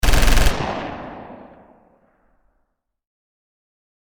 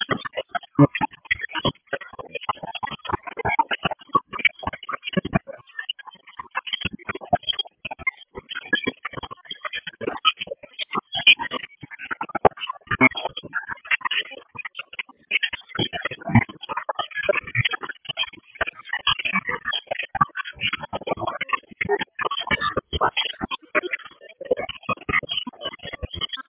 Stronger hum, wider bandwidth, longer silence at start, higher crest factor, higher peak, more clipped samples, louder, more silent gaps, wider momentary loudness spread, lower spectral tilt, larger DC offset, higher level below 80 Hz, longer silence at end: neither; first, 19.5 kHz vs 4 kHz; about the same, 0.05 s vs 0 s; second, 16 dB vs 24 dB; about the same, -4 dBFS vs -2 dBFS; neither; first, -21 LUFS vs -24 LUFS; neither; first, 24 LU vs 13 LU; first, -4 dB/octave vs -2 dB/octave; neither; first, -24 dBFS vs -48 dBFS; first, 2.5 s vs 0.05 s